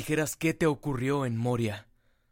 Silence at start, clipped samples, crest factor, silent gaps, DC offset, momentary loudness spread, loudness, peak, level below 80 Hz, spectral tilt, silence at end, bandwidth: 0 s; under 0.1%; 16 dB; none; under 0.1%; 5 LU; -29 LUFS; -14 dBFS; -54 dBFS; -6 dB/octave; 0.5 s; 16.5 kHz